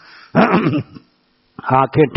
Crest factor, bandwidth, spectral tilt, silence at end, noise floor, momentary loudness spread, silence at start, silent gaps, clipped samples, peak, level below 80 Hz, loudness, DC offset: 16 dB; 6 kHz; -6 dB/octave; 0 s; -59 dBFS; 14 LU; 0.35 s; none; under 0.1%; 0 dBFS; -50 dBFS; -16 LUFS; under 0.1%